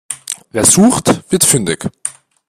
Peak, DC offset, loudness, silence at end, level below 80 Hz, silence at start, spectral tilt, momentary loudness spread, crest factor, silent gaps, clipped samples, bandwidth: 0 dBFS; under 0.1%; -11 LUFS; 0.35 s; -46 dBFS; 0.1 s; -3.5 dB/octave; 15 LU; 14 dB; none; under 0.1%; over 20 kHz